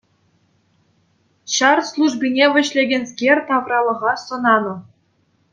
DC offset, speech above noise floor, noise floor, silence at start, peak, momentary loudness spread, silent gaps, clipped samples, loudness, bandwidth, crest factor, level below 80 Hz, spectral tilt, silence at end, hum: under 0.1%; 45 dB; -62 dBFS; 1.45 s; 0 dBFS; 7 LU; none; under 0.1%; -17 LUFS; 9.4 kHz; 20 dB; -70 dBFS; -2.5 dB/octave; 0.7 s; none